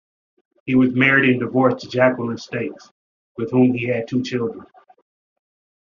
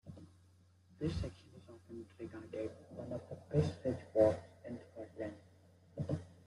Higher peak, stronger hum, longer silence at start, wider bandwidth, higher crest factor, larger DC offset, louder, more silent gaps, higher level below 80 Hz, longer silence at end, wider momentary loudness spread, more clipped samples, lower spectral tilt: first, -2 dBFS vs -16 dBFS; neither; first, 0.65 s vs 0.05 s; second, 7.2 kHz vs 11.5 kHz; second, 18 dB vs 24 dB; neither; first, -19 LUFS vs -40 LUFS; first, 2.91-3.35 s vs none; about the same, -60 dBFS vs -62 dBFS; first, 1.2 s vs 0.15 s; second, 16 LU vs 23 LU; neither; second, -5 dB/octave vs -8 dB/octave